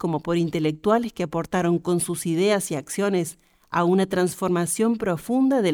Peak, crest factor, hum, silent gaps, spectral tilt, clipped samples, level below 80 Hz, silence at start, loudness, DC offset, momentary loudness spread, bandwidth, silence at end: -8 dBFS; 16 dB; none; none; -5.5 dB/octave; under 0.1%; -56 dBFS; 0 s; -23 LUFS; under 0.1%; 6 LU; 19.5 kHz; 0 s